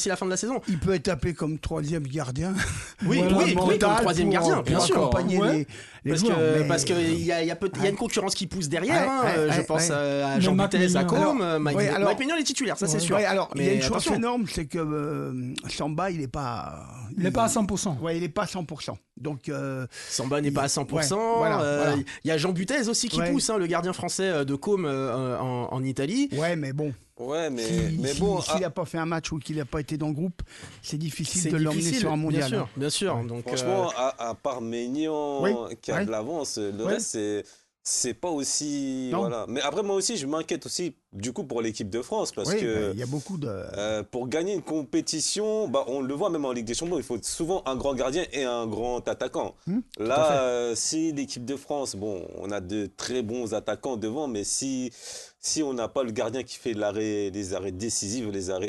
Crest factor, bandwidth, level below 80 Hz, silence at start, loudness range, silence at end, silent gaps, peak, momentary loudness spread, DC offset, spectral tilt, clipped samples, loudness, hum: 18 dB; 12.5 kHz; -50 dBFS; 0 s; 6 LU; 0 s; none; -10 dBFS; 10 LU; under 0.1%; -4.5 dB/octave; under 0.1%; -27 LUFS; none